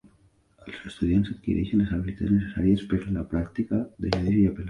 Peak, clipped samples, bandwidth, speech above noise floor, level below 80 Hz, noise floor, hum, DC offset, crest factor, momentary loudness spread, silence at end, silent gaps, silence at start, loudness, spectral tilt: -8 dBFS; under 0.1%; 9.8 kHz; 36 dB; -40 dBFS; -61 dBFS; none; under 0.1%; 18 dB; 6 LU; 0 s; none; 0.65 s; -26 LUFS; -8.5 dB/octave